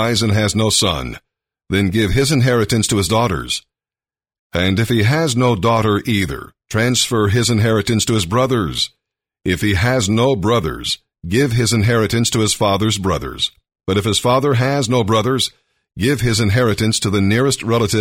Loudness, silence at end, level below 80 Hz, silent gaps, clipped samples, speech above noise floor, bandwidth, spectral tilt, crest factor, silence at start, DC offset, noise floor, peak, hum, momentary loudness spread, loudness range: -16 LUFS; 0 s; -38 dBFS; 4.39-4.50 s; under 0.1%; over 74 dB; 16.5 kHz; -4.5 dB/octave; 14 dB; 0 s; under 0.1%; under -90 dBFS; -2 dBFS; none; 7 LU; 2 LU